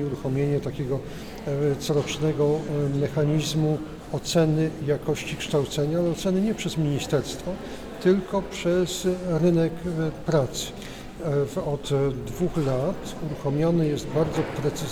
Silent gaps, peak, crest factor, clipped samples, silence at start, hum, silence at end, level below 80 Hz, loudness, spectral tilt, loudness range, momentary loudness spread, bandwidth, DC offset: none; -10 dBFS; 16 dB; under 0.1%; 0 s; none; 0 s; -46 dBFS; -26 LUFS; -6 dB/octave; 2 LU; 9 LU; 16 kHz; under 0.1%